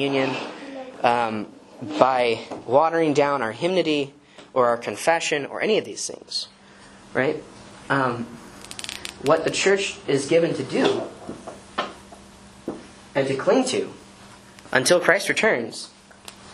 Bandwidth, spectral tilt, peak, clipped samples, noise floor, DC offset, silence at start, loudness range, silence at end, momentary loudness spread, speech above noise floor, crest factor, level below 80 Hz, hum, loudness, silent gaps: 13 kHz; -4 dB/octave; 0 dBFS; under 0.1%; -48 dBFS; under 0.1%; 0 s; 5 LU; 0 s; 18 LU; 26 dB; 24 dB; -60 dBFS; none; -22 LUFS; none